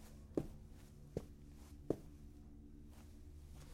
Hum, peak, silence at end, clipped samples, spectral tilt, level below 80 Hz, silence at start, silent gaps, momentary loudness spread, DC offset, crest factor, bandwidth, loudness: none; -20 dBFS; 0 s; under 0.1%; -7.5 dB/octave; -58 dBFS; 0 s; none; 14 LU; under 0.1%; 30 dB; 16.5 kHz; -52 LUFS